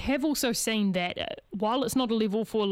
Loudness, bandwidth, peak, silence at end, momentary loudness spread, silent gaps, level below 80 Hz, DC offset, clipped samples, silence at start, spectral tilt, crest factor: -28 LUFS; 17 kHz; -14 dBFS; 0 s; 5 LU; none; -54 dBFS; under 0.1%; under 0.1%; 0 s; -4 dB/octave; 14 dB